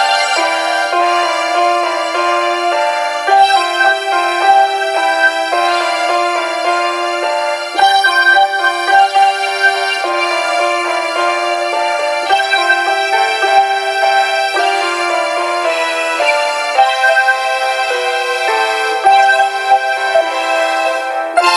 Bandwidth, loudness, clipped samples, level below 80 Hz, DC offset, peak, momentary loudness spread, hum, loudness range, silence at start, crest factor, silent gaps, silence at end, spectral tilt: 14 kHz; -12 LUFS; under 0.1%; -70 dBFS; under 0.1%; 0 dBFS; 5 LU; none; 2 LU; 0 s; 12 dB; none; 0 s; 1 dB/octave